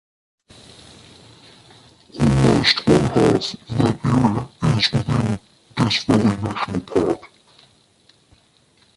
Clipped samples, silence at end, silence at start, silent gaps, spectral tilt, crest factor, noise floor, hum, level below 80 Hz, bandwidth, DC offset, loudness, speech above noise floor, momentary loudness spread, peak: under 0.1%; 1.7 s; 2.15 s; none; -6 dB/octave; 18 dB; -57 dBFS; none; -40 dBFS; 11.5 kHz; under 0.1%; -19 LUFS; 38 dB; 10 LU; -2 dBFS